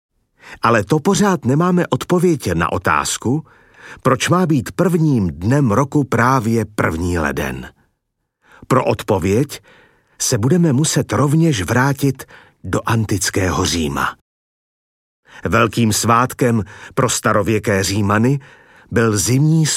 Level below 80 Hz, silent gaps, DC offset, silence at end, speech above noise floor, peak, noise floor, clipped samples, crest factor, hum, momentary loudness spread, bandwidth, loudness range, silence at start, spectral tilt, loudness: -42 dBFS; 14.21-15.23 s; under 0.1%; 0 s; 57 dB; -2 dBFS; -73 dBFS; under 0.1%; 16 dB; none; 7 LU; 16.5 kHz; 4 LU; 0.45 s; -5 dB/octave; -16 LUFS